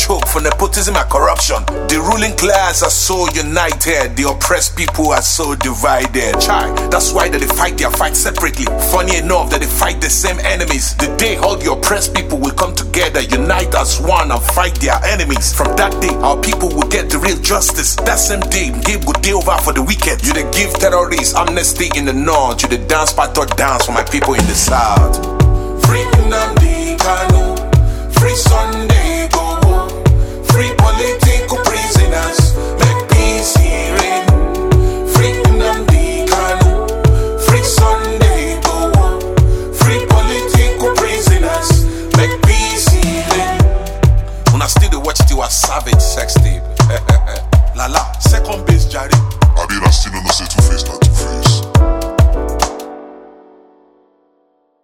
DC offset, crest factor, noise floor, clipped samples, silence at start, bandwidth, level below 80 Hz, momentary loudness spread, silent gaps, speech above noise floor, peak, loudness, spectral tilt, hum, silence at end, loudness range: under 0.1%; 12 dB; -58 dBFS; under 0.1%; 0 s; 17.5 kHz; -16 dBFS; 3 LU; none; 45 dB; 0 dBFS; -13 LUFS; -4 dB/octave; none; 1.55 s; 1 LU